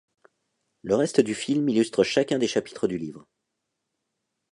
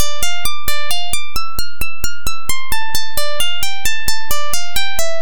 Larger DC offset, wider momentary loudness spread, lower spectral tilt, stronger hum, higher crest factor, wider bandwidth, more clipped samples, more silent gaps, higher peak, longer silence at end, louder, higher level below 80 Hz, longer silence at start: second, under 0.1% vs 40%; first, 9 LU vs 5 LU; first, -5 dB/octave vs -1 dB/octave; neither; about the same, 20 dB vs 16 dB; second, 11.5 kHz vs 19 kHz; neither; neither; second, -6 dBFS vs 0 dBFS; first, 1.35 s vs 0 s; second, -24 LUFS vs -21 LUFS; second, -64 dBFS vs -34 dBFS; first, 0.85 s vs 0 s